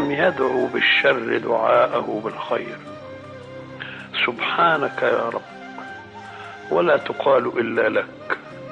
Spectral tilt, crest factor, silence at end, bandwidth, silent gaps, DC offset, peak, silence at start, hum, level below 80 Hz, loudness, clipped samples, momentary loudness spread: -6 dB/octave; 16 dB; 0 s; 9.2 kHz; none; under 0.1%; -4 dBFS; 0 s; none; -64 dBFS; -20 LUFS; under 0.1%; 20 LU